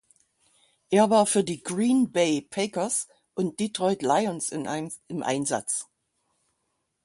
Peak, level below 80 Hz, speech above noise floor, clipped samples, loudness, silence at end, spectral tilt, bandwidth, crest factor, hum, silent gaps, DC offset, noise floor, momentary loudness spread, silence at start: -8 dBFS; -70 dBFS; 52 dB; under 0.1%; -26 LUFS; 1.2 s; -4 dB/octave; 11.5 kHz; 20 dB; none; none; under 0.1%; -77 dBFS; 11 LU; 0.9 s